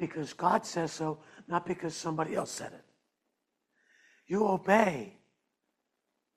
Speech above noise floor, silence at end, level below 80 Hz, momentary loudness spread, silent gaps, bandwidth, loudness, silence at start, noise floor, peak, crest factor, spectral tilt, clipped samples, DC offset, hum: 51 dB; 1.25 s; -72 dBFS; 15 LU; none; 14 kHz; -31 LUFS; 0 s; -83 dBFS; -10 dBFS; 24 dB; -5 dB/octave; under 0.1%; under 0.1%; none